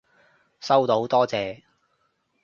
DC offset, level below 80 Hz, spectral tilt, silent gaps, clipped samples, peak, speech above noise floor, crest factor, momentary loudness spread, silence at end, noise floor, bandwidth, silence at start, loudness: under 0.1%; -66 dBFS; -5.5 dB/octave; none; under 0.1%; -6 dBFS; 49 dB; 20 dB; 17 LU; 0.9 s; -70 dBFS; 7.4 kHz; 0.6 s; -22 LUFS